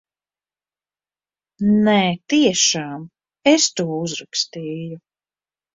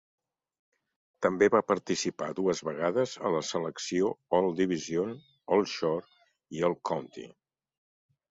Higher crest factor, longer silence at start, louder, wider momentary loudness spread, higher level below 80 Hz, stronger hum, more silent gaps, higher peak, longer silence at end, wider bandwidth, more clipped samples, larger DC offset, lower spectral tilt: about the same, 20 dB vs 20 dB; first, 1.6 s vs 1.2 s; first, -18 LUFS vs -30 LUFS; first, 15 LU vs 10 LU; first, -60 dBFS vs -70 dBFS; first, 50 Hz at -50 dBFS vs none; neither; first, -2 dBFS vs -10 dBFS; second, 0.8 s vs 1 s; about the same, 7.8 kHz vs 8 kHz; neither; neither; about the same, -3.5 dB/octave vs -4.5 dB/octave